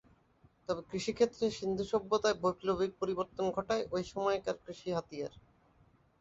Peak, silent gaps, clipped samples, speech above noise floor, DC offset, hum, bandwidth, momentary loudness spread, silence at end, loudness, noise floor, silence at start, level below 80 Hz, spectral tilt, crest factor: -16 dBFS; none; under 0.1%; 33 dB; under 0.1%; none; 8 kHz; 9 LU; 0.8 s; -35 LUFS; -67 dBFS; 0.7 s; -64 dBFS; -5 dB/octave; 20 dB